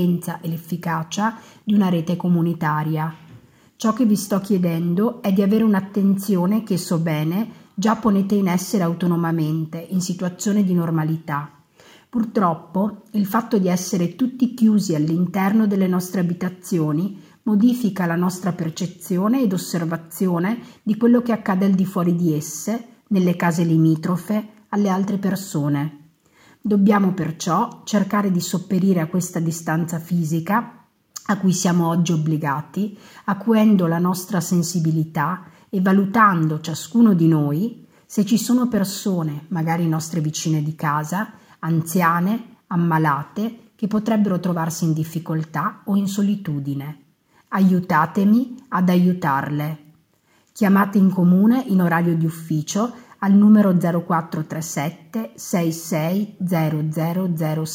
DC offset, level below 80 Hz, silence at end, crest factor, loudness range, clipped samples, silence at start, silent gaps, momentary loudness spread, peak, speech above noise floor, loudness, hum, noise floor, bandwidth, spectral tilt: under 0.1%; -66 dBFS; 0 s; 18 dB; 4 LU; under 0.1%; 0 s; none; 10 LU; -2 dBFS; 41 dB; -20 LUFS; none; -60 dBFS; 16.5 kHz; -6.5 dB/octave